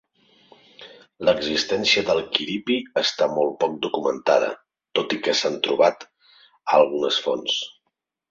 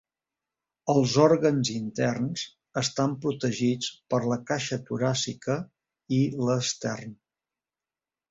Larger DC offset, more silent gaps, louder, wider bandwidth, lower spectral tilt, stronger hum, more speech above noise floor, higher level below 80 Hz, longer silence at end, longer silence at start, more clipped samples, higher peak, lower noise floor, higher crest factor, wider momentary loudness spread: neither; neither; first, -22 LUFS vs -27 LUFS; about the same, 7.6 kHz vs 8 kHz; second, -3 dB/octave vs -5 dB/octave; neither; second, 56 dB vs over 64 dB; about the same, -62 dBFS vs -64 dBFS; second, 0.6 s vs 1.15 s; about the same, 0.8 s vs 0.85 s; neither; first, -2 dBFS vs -6 dBFS; second, -78 dBFS vs under -90 dBFS; about the same, 22 dB vs 22 dB; second, 8 LU vs 12 LU